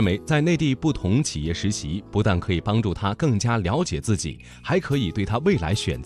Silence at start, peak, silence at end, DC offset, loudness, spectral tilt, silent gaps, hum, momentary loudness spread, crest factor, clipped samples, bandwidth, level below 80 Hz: 0 s; -8 dBFS; 0 s; under 0.1%; -23 LUFS; -5.5 dB/octave; none; none; 5 LU; 16 dB; under 0.1%; 13 kHz; -40 dBFS